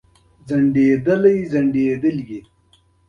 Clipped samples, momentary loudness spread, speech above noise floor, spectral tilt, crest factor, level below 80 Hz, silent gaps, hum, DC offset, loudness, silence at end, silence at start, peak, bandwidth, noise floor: under 0.1%; 13 LU; 40 dB; -9 dB/octave; 16 dB; -54 dBFS; none; none; under 0.1%; -17 LUFS; 0.7 s; 0.45 s; -4 dBFS; 6.6 kHz; -57 dBFS